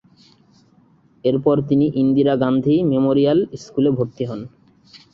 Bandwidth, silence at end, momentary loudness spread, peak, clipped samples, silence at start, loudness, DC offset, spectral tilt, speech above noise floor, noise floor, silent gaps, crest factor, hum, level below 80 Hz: 7 kHz; 0.15 s; 10 LU; -4 dBFS; under 0.1%; 1.25 s; -18 LUFS; under 0.1%; -8.5 dB/octave; 37 dB; -54 dBFS; none; 16 dB; none; -54 dBFS